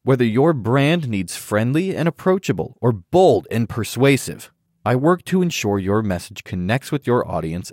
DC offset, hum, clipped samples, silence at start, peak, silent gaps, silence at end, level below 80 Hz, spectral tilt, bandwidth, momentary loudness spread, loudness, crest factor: under 0.1%; none; under 0.1%; 0.05 s; -2 dBFS; none; 0 s; -52 dBFS; -6.5 dB/octave; 16.5 kHz; 9 LU; -19 LUFS; 16 dB